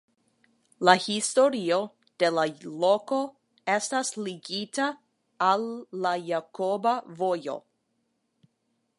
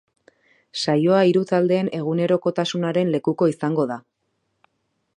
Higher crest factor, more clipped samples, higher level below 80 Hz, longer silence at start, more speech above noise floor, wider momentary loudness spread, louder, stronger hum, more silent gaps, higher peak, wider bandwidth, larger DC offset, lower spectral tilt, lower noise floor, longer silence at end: first, 26 dB vs 18 dB; neither; second, -82 dBFS vs -70 dBFS; about the same, 0.8 s vs 0.75 s; second, 49 dB vs 53 dB; first, 12 LU vs 8 LU; second, -27 LUFS vs -21 LUFS; neither; neither; about the same, -2 dBFS vs -4 dBFS; about the same, 11.5 kHz vs 10.5 kHz; neither; second, -3.5 dB/octave vs -6.5 dB/octave; about the same, -76 dBFS vs -73 dBFS; first, 1.4 s vs 1.15 s